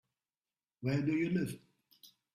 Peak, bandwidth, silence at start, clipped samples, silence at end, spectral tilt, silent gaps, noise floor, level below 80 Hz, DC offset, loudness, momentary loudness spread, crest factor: -22 dBFS; 15 kHz; 0.8 s; under 0.1%; 0.25 s; -7.5 dB/octave; none; under -90 dBFS; -70 dBFS; under 0.1%; -35 LUFS; 9 LU; 16 dB